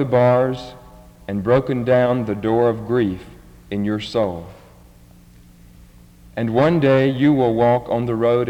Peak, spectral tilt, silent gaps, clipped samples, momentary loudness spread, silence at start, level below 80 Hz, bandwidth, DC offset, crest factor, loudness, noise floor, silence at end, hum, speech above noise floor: -4 dBFS; -8.5 dB/octave; none; under 0.1%; 14 LU; 0 s; -48 dBFS; 17 kHz; under 0.1%; 16 dB; -18 LUFS; -46 dBFS; 0 s; none; 29 dB